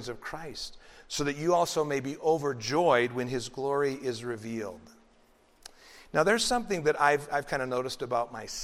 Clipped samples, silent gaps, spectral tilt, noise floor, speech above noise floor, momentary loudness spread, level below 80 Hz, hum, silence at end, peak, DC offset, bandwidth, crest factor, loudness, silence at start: under 0.1%; none; -4 dB/octave; -62 dBFS; 33 dB; 14 LU; -56 dBFS; none; 0 s; -8 dBFS; under 0.1%; 16 kHz; 22 dB; -29 LUFS; 0 s